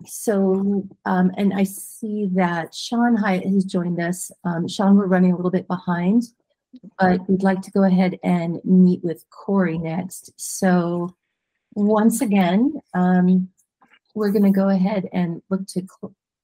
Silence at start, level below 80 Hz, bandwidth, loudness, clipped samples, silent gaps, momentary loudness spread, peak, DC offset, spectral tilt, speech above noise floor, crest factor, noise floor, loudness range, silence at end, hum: 0 s; -62 dBFS; 16 kHz; -20 LUFS; under 0.1%; none; 12 LU; -4 dBFS; under 0.1%; -7 dB/octave; 58 dB; 16 dB; -77 dBFS; 2 LU; 0.35 s; none